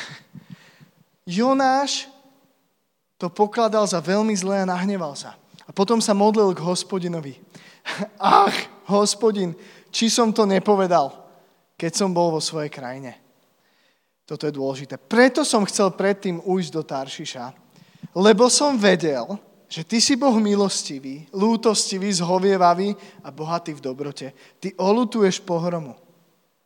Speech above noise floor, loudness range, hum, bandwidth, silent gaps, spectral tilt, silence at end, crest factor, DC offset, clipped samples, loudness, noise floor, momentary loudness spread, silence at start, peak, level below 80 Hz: 52 dB; 5 LU; none; 16.5 kHz; none; -4 dB/octave; 0.75 s; 22 dB; under 0.1%; under 0.1%; -21 LUFS; -72 dBFS; 17 LU; 0 s; 0 dBFS; -82 dBFS